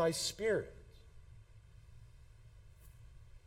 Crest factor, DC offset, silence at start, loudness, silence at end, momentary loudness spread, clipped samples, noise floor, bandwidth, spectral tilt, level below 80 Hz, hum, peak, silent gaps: 20 dB; under 0.1%; 0 s; -37 LUFS; 0.1 s; 26 LU; under 0.1%; -59 dBFS; 16.5 kHz; -3.5 dB/octave; -60 dBFS; none; -22 dBFS; none